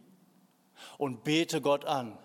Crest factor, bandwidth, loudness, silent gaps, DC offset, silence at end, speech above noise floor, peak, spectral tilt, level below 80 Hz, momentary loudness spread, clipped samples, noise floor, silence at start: 20 dB; 16.5 kHz; -31 LUFS; none; under 0.1%; 0.05 s; 35 dB; -14 dBFS; -4.5 dB/octave; -80 dBFS; 18 LU; under 0.1%; -65 dBFS; 0.8 s